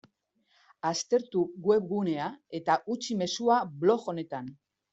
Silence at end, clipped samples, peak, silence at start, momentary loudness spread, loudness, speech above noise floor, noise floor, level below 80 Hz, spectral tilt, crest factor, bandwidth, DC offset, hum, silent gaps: 0.4 s; under 0.1%; -12 dBFS; 0.85 s; 10 LU; -29 LUFS; 44 dB; -72 dBFS; -74 dBFS; -5 dB/octave; 18 dB; 8 kHz; under 0.1%; none; none